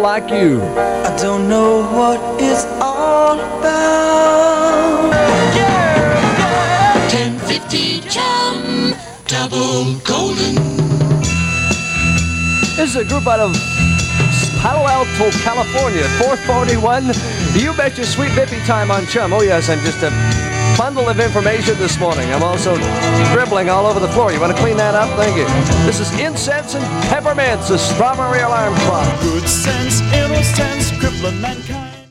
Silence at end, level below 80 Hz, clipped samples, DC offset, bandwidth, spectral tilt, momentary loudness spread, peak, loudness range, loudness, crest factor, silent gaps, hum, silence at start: 0.05 s; -32 dBFS; under 0.1%; under 0.1%; 16 kHz; -4.5 dB/octave; 5 LU; 0 dBFS; 3 LU; -14 LUFS; 14 dB; none; none; 0 s